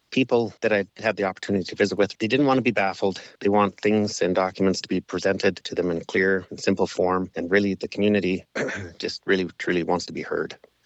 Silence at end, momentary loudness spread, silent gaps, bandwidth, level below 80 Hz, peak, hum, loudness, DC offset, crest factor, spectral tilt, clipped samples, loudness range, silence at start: 0.3 s; 7 LU; none; 8.2 kHz; -66 dBFS; -8 dBFS; none; -24 LUFS; under 0.1%; 16 dB; -5.5 dB/octave; under 0.1%; 2 LU; 0.1 s